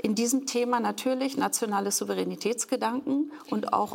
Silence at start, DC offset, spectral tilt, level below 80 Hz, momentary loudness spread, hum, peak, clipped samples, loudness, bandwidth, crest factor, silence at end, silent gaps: 0.05 s; under 0.1%; -3.5 dB/octave; -76 dBFS; 4 LU; none; -12 dBFS; under 0.1%; -28 LUFS; 17 kHz; 16 dB; 0 s; none